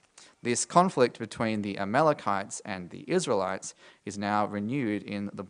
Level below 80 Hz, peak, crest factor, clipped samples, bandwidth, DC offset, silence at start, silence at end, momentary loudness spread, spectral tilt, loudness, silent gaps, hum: -72 dBFS; -6 dBFS; 22 dB; under 0.1%; 10.5 kHz; under 0.1%; 0.2 s; 0.05 s; 13 LU; -4.5 dB/octave; -29 LUFS; none; none